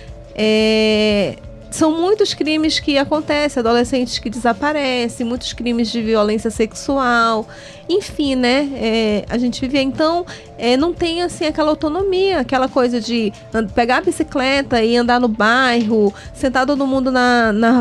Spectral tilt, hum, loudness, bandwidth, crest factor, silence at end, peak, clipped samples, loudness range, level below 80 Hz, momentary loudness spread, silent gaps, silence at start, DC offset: -4.5 dB/octave; none; -16 LUFS; 12.5 kHz; 12 dB; 0 s; -4 dBFS; under 0.1%; 3 LU; -40 dBFS; 7 LU; none; 0 s; under 0.1%